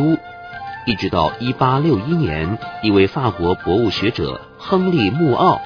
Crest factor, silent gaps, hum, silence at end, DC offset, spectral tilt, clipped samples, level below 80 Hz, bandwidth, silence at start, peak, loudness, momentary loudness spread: 16 dB; none; none; 0 s; under 0.1%; -8 dB/octave; under 0.1%; -42 dBFS; 5.4 kHz; 0 s; -2 dBFS; -18 LUFS; 10 LU